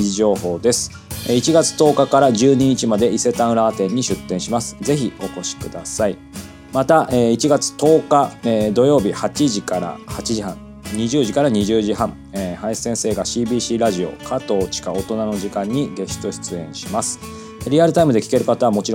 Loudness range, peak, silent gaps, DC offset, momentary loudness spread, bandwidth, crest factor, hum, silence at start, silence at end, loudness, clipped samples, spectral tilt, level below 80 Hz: 6 LU; 0 dBFS; none; under 0.1%; 12 LU; 17 kHz; 18 dB; none; 0 s; 0 s; -18 LUFS; under 0.1%; -5 dB/octave; -44 dBFS